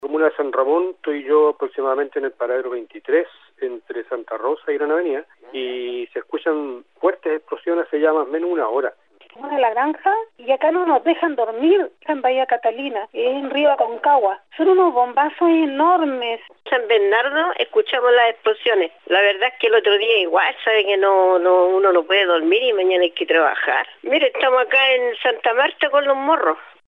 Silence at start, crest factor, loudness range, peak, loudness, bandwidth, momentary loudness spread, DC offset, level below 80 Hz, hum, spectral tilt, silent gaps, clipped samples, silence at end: 0.05 s; 12 dB; 8 LU; -6 dBFS; -18 LUFS; 5.4 kHz; 11 LU; under 0.1%; -82 dBFS; none; -4.5 dB/octave; none; under 0.1%; 0.25 s